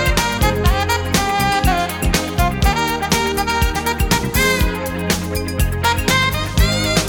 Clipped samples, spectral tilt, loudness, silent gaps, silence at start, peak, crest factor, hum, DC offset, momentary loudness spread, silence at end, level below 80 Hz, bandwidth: under 0.1%; -4 dB/octave; -17 LUFS; none; 0 s; -2 dBFS; 14 dB; none; under 0.1%; 4 LU; 0 s; -22 dBFS; over 20 kHz